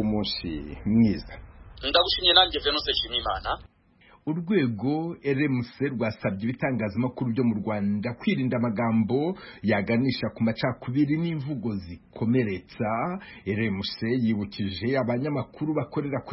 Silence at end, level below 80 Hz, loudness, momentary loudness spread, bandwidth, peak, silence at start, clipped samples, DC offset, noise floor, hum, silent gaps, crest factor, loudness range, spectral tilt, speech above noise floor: 0 s; -50 dBFS; -26 LUFS; 9 LU; 5.8 kHz; -4 dBFS; 0 s; under 0.1%; under 0.1%; -58 dBFS; none; none; 22 dB; 5 LU; -9.5 dB/octave; 31 dB